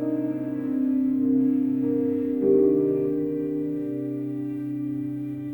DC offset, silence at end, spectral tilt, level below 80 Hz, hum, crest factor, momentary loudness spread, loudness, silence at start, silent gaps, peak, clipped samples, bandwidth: under 0.1%; 0 s; -11 dB/octave; -64 dBFS; none; 14 dB; 9 LU; -25 LUFS; 0 s; none; -10 dBFS; under 0.1%; 19 kHz